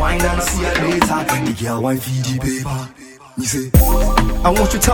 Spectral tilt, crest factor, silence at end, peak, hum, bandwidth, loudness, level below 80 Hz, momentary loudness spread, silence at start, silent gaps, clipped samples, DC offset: -4.5 dB/octave; 16 dB; 0 s; 0 dBFS; none; 19 kHz; -17 LUFS; -22 dBFS; 9 LU; 0 s; none; under 0.1%; under 0.1%